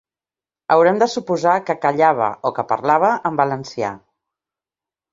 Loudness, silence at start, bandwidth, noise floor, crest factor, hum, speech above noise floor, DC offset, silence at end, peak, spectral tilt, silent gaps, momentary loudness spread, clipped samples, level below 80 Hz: -18 LUFS; 0.7 s; 7.8 kHz; under -90 dBFS; 18 dB; none; over 73 dB; under 0.1%; 1.15 s; -2 dBFS; -5.5 dB/octave; none; 10 LU; under 0.1%; -64 dBFS